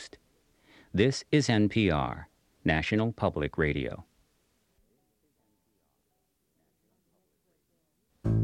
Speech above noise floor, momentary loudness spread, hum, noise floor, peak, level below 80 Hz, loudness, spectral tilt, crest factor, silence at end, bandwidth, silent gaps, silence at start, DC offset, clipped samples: 49 dB; 12 LU; none; -76 dBFS; -10 dBFS; -50 dBFS; -28 LUFS; -6 dB/octave; 22 dB; 0 s; 10.5 kHz; none; 0 s; under 0.1%; under 0.1%